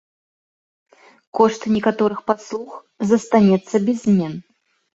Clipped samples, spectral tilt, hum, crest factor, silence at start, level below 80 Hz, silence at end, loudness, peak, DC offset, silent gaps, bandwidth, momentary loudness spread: under 0.1%; -7 dB/octave; none; 18 dB; 1.35 s; -60 dBFS; 0.55 s; -18 LUFS; -2 dBFS; under 0.1%; none; 8 kHz; 15 LU